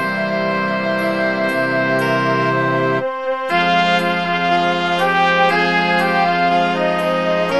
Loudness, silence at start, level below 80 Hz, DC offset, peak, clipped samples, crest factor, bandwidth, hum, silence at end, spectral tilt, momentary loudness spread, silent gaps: -16 LUFS; 0 s; -58 dBFS; 0.5%; -2 dBFS; under 0.1%; 14 dB; 12.5 kHz; none; 0 s; -5.5 dB/octave; 4 LU; none